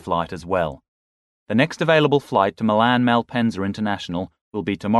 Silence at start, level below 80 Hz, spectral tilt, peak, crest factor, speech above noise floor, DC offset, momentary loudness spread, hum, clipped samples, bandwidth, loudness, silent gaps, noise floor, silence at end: 0.05 s; -52 dBFS; -6.5 dB/octave; -4 dBFS; 18 dB; over 70 dB; under 0.1%; 11 LU; none; under 0.1%; 12 kHz; -21 LUFS; 0.88-1.46 s, 4.41-4.51 s; under -90 dBFS; 0 s